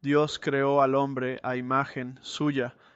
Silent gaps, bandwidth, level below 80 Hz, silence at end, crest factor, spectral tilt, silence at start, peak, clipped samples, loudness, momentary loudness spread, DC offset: none; 8.2 kHz; -68 dBFS; 0.25 s; 16 dB; -6 dB/octave; 0.05 s; -10 dBFS; under 0.1%; -27 LUFS; 10 LU; under 0.1%